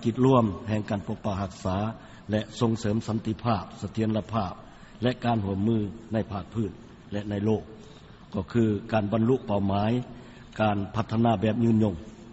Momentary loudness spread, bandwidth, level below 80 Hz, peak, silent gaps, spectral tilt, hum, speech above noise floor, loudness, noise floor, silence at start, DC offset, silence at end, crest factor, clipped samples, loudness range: 12 LU; 8 kHz; -52 dBFS; -8 dBFS; none; -7 dB/octave; none; 22 dB; -27 LUFS; -48 dBFS; 0 s; under 0.1%; 0 s; 18 dB; under 0.1%; 4 LU